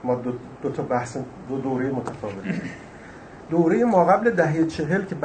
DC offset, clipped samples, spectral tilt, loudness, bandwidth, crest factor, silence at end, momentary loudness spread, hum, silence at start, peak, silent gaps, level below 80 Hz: under 0.1%; under 0.1%; -7.5 dB/octave; -23 LUFS; 9.2 kHz; 20 dB; 0 s; 19 LU; none; 0 s; -4 dBFS; none; -54 dBFS